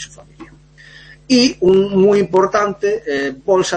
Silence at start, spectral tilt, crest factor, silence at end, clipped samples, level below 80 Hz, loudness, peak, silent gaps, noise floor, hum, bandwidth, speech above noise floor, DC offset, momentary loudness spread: 0 s; -5 dB/octave; 14 dB; 0 s; under 0.1%; -48 dBFS; -15 LUFS; -2 dBFS; none; -43 dBFS; none; 8.8 kHz; 28 dB; under 0.1%; 8 LU